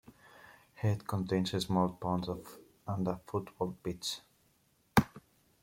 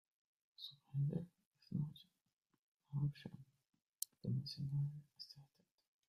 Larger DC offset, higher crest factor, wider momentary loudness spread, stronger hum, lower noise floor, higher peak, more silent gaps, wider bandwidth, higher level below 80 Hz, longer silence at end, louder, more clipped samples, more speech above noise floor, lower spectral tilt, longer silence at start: neither; about the same, 26 dB vs 28 dB; about the same, 13 LU vs 15 LU; neither; second, -71 dBFS vs -87 dBFS; first, -8 dBFS vs -20 dBFS; second, none vs 1.46-1.52 s, 2.33-2.37 s, 2.58-2.80 s, 3.82-3.93 s; about the same, 16.5 kHz vs 15 kHz; first, -58 dBFS vs -78 dBFS; second, 0.45 s vs 0.65 s; first, -35 LUFS vs -46 LUFS; neither; second, 37 dB vs 45 dB; about the same, -6 dB/octave vs -6 dB/octave; second, 0.1 s vs 0.6 s